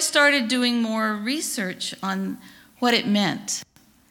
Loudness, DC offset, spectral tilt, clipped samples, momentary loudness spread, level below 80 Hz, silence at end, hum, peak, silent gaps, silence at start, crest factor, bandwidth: -23 LUFS; under 0.1%; -3 dB/octave; under 0.1%; 11 LU; -68 dBFS; 0.45 s; none; -4 dBFS; none; 0 s; 20 dB; 19 kHz